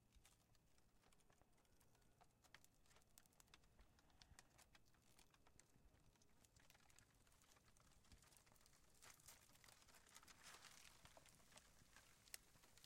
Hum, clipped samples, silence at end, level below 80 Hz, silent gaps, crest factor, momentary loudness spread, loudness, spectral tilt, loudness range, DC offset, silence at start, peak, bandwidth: none; under 0.1%; 0 s; -82 dBFS; none; 38 dB; 7 LU; -66 LUFS; -2 dB/octave; 3 LU; under 0.1%; 0 s; -34 dBFS; 16 kHz